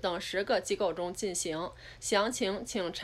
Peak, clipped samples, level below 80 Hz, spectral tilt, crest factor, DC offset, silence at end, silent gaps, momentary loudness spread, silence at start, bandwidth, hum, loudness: -16 dBFS; under 0.1%; -58 dBFS; -2.5 dB/octave; 18 dB; under 0.1%; 0 s; none; 7 LU; 0 s; 15.5 kHz; none; -32 LUFS